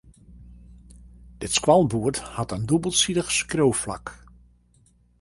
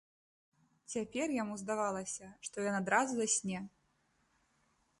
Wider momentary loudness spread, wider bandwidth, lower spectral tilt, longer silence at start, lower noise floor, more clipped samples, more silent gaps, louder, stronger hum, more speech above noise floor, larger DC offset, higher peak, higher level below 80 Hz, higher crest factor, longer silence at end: about the same, 14 LU vs 12 LU; about the same, 11.5 kHz vs 11.5 kHz; about the same, -4 dB/octave vs -3.5 dB/octave; second, 0.3 s vs 0.9 s; second, -60 dBFS vs -76 dBFS; neither; neither; first, -22 LUFS vs -36 LUFS; first, 60 Hz at -45 dBFS vs none; about the same, 37 dB vs 40 dB; neither; first, -4 dBFS vs -16 dBFS; first, -48 dBFS vs -76 dBFS; about the same, 22 dB vs 22 dB; second, 1.05 s vs 1.3 s